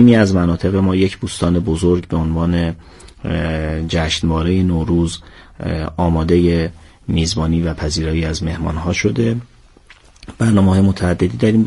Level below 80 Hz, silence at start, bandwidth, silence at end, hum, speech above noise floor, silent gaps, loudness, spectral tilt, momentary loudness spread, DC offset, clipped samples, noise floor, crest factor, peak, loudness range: -30 dBFS; 0 s; 11.5 kHz; 0 s; none; 30 dB; none; -17 LUFS; -6.5 dB/octave; 9 LU; under 0.1%; under 0.1%; -45 dBFS; 16 dB; 0 dBFS; 2 LU